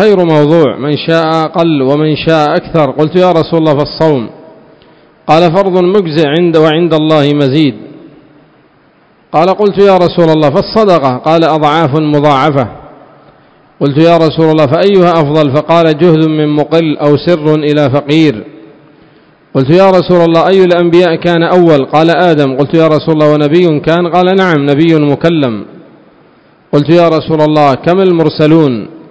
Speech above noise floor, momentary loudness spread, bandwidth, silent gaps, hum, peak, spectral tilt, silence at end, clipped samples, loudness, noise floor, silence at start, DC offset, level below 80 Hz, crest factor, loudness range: 38 dB; 4 LU; 8 kHz; none; none; 0 dBFS; -8 dB/octave; 0.1 s; 3%; -8 LUFS; -46 dBFS; 0 s; 0.4%; -44 dBFS; 8 dB; 3 LU